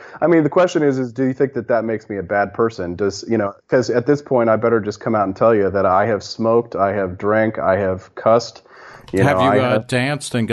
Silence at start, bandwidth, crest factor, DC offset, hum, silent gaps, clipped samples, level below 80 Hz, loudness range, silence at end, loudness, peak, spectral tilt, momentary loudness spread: 0 s; 12 kHz; 14 dB; under 0.1%; none; none; under 0.1%; -56 dBFS; 2 LU; 0 s; -18 LUFS; -4 dBFS; -6.5 dB/octave; 7 LU